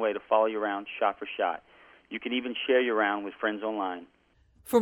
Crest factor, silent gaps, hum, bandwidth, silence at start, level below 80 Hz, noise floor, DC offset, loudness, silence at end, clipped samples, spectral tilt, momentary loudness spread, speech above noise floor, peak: 20 dB; none; none; 11 kHz; 0 s; -70 dBFS; -63 dBFS; under 0.1%; -29 LUFS; 0 s; under 0.1%; -4 dB/octave; 10 LU; 34 dB; -10 dBFS